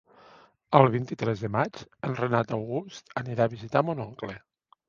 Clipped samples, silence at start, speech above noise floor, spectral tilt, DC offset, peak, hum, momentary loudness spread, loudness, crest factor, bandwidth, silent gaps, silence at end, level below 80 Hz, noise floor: under 0.1%; 0.7 s; 29 dB; -7.5 dB/octave; under 0.1%; -2 dBFS; none; 15 LU; -27 LUFS; 26 dB; 7.2 kHz; none; 0.5 s; -62 dBFS; -56 dBFS